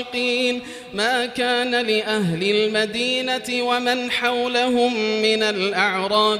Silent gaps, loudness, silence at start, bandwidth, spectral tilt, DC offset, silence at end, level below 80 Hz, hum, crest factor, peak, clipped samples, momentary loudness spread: none; -20 LUFS; 0 s; 15.5 kHz; -3.5 dB/octave; under 0.1%; 0 s; -60 dBFS; none; 16 dB; -4 dBFS; under 0.1%; 3 LU